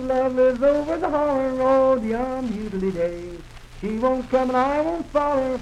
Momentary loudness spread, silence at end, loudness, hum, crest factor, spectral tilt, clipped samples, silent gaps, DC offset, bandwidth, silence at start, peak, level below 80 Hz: 9 LU; 0 s; -22 LUFS; none; 14 dB; -7 dB/octave; under 0.1%; none; under 0.1%; 10 kHz; 0 s; -8 dBFS; -42 dBFS